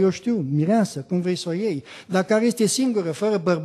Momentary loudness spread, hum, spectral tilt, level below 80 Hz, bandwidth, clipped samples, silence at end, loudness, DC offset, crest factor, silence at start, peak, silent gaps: 6 LU; none; -5.5 dB/octave; -68 dBFS; 13 kHz; under 0.1%; 0 s; -22 LUFS; under 0.1%; 14 dB; 0 s; -8 dBFS; none